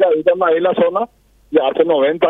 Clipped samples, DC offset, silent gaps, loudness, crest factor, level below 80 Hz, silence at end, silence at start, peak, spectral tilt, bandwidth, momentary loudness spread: under 0.1%; under 0.1%; none; -15 LUFS; 14 dB; -56 dBFS; 0 s; 0 s; 0 dBFS; -7.5 dB/octave; 3.9 kHz; 6 LU